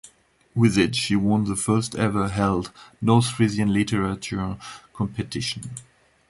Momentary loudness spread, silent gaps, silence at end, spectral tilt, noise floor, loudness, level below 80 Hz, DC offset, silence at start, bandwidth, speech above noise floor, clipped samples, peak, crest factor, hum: 13 LU; none; 0.5 s; -5.5 dB/octave; -57 dBFS; -23 LUFS; -46 dBFS; under 0.1%; 0.05 s; 11.5 kHz; 35 dB; under 0.1%; -6 dBFS; 18 dB; none